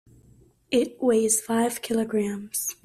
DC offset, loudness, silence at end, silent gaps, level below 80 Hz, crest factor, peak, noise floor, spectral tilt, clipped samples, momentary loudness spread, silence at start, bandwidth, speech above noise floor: under 0.1%; -24 LUFS; 0.1 s; none; -64 dBFS; 16 dB; -8 dBFS; -57 dBFS; -3.5 dB/octave; under 0.1%; 7 LU; 0.7 s; 15.5 kHz; 32 dB